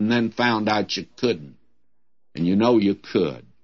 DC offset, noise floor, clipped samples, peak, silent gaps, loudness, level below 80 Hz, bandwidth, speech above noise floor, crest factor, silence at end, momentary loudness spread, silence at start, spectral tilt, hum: 0.2%; -78 dBFS; under 0.1%; -6 dBFS; none; -22 LUFS; -62 dBFS; 7 kHz; 57 dB; 18 dB; 0.25 s; 9 LU; 0 s; -6 dB/octave; none